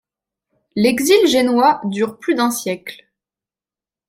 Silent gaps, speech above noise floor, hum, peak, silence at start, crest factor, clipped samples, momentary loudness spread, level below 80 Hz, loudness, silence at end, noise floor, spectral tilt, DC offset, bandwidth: none; over 74 dB; none; -2 dBFS; 0.75 s; 16 dB; under 0.1%; 14 LU; -60 dBFS; -16 LUFS; 1.15 s; under -90 dBFS; -4 dB/octave; under 0.1%; 16.5 kHz